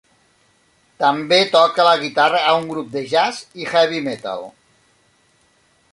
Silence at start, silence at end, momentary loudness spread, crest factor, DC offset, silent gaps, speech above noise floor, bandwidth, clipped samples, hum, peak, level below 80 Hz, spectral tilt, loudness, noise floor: 1 s; 1.45 s; 14 LU; 18 dB; under 0.1%; none; 42 dB; 11.5 kHz; under 0.1%; none; -2 dBFS; -66 dBFS; -3.5 dB/octave; -17 LUFS; -59 dBFS